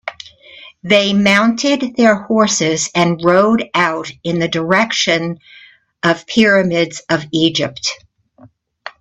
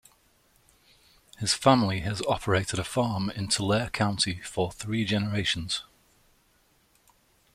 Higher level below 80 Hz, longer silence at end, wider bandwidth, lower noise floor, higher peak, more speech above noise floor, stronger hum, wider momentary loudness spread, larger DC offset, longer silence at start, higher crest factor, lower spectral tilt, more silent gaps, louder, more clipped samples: about the same, -54 dBFS vs -54 dBFS; second, 0.1 s vs 1.75 s; second, 8.8 kHz vs 15.5 kHz; second, -47 dBFS vs -65 dBFS; first, 0 dBFS vs -6 dBFS; second, 33 dB vs 39 dB; neither; first, 12 LU vs 9 LU; neither; second, 0.05 s vs 1.4 s; second, 16 dB vs 24 dB; about the same, -4 dB/octave vs -4.5 dB/octave; neither; first, -14 LUFS vs -27 LUFS; neither